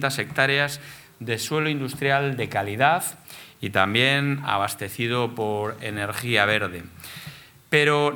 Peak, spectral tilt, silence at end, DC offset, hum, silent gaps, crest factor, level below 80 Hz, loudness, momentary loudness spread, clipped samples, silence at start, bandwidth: -2 dBFS; -4 dB/octave; 0 s; under 0.1%; none; none; 22 dB; -62 dBFS; -23 LUFS; 19 LU; under 0.1%; 0 s; 19 kHz